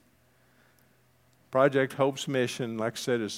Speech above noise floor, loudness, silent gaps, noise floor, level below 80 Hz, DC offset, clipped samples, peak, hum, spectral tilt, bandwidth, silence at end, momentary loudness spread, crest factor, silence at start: 37 dB; -28 LUFS; none; -65 dBFS; -78 dBFS; under 0.1%; under 0.1%; -8 dBFS; none; -5 dB/octave; 16.5 kHz; 0 s; 7 LU; 22 dB; 1.5 s